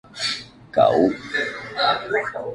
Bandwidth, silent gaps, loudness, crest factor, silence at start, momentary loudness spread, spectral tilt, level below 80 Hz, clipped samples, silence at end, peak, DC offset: 11.5 kHz; none; -21 LUFS; 18 dB; 0.1 s; 9 LU; -4 dB/octave; -56 dBFS; under 0.1%; 0 s; -4 dBFS; under 0.1%